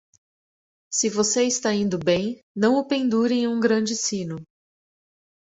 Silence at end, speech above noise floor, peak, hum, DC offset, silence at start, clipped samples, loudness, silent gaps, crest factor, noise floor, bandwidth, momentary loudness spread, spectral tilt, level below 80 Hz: 1.05 s; over 68 dB; -6 dBFS; none; under 0.1%; 0.9 s; under 0.1%; -22 LUFS; 2.43-2.55 s; 18 dB; under -90 dBFS; 8.2 kHz; 8 LU; -3.5 dB/octave; -62 dBFS